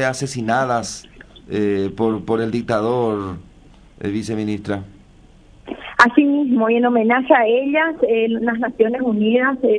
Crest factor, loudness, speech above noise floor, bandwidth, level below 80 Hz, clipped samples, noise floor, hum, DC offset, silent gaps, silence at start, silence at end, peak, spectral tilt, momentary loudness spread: 18 dB; -18 LUFS; 29 dB; 11 kHz; -50 dBFS; under 0.1%; -47 dBFS; none; under 0.1%; none; 0 s; 0 s; 0 dBFS; -5.5 dB/octave; 13 LU